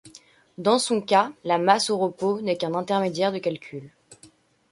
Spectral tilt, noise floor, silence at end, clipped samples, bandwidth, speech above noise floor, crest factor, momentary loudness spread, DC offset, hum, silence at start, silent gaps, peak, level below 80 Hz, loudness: -4 dB/octave; -55 dBFS; 0.45 s; under 0.1%; 11.5 kHz; 32 dB; 22 dB; 9 LU; under 0.1%; none; 0.05 s; none; -4 dBFS; -72 dBFS; -23 LUFS